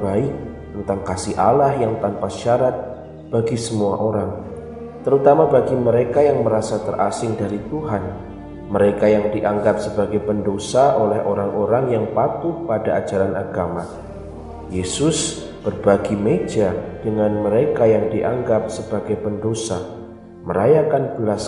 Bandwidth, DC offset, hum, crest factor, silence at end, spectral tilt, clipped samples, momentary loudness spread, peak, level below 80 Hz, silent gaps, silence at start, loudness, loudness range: 11.5 kHz; under 0.1%; none; 18 dB; 0 s; -6 dB/octave; under 0.1%; 14 LU; 0 dBFS; -44 dBFS; none; 0 s; -19 LUFS; 4 LU